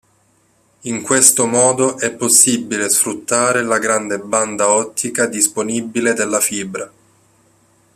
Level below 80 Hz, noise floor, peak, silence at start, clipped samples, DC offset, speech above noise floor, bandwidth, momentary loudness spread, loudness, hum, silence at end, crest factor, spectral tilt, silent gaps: -60 dBFS; -57 dBFS; 0 dBFS; 0.85 s; under 0.1%; under 0.1%; 41 dB; 15 kHz; 13 LU; -14 LUFS; none; 1.1 s; 18 dB; -2 dB/octave; none